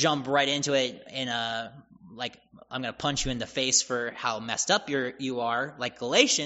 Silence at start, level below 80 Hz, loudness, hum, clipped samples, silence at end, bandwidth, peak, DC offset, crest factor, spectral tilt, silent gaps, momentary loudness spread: 0 s; -52 dBFS; -27 LUFS; none; under 0.1%; 0 s; 8 kHz; -4 dBFS; under 0.1%; 24 dB; -1.5 dB/octave; none; 12 LU